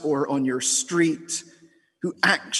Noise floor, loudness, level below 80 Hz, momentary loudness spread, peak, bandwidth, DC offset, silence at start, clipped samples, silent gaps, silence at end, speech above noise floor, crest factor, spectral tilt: -57 dBFS; -23 LUFS; -72 dBFS; 10 LU; -4 dBFS; 12.5 kHz; under 0.1%; 0 s; under 0.1%; none; 0 s; 33 dB; 22 dB; -2.5 dB/octave